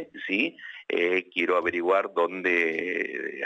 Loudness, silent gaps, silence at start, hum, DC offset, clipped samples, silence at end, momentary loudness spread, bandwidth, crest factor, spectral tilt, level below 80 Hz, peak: -26 LUFS; none; 0 s; none; under 0.1%; under 0.1%; 0 s; 6 LU; 8.2 kHz; 16 dB; -5 dB/octave; -76 dBFS; -10 dBFS